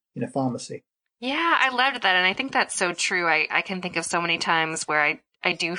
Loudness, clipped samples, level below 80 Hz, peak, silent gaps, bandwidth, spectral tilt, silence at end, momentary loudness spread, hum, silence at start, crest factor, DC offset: -23 LUFS; under 0.1%; -72 dBFS; -6 dBFS; none; 10.5 kHz; -2.5 dB/octave; 0 s; 9 LU; none; 0.15 s; 20 dB; under 0.1%